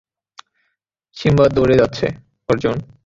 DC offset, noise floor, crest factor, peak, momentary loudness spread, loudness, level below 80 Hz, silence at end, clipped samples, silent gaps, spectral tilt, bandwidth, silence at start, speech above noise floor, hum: under 0.1%; -72 dBFS; 16 dB; -2 dBFS; 10 LU; -17 LUFS; -40 dBFS; 0.2 s; under 0.1%; none; -7.5 dB/octave; 7.8 kHz; 1.15 s; 57 dB; none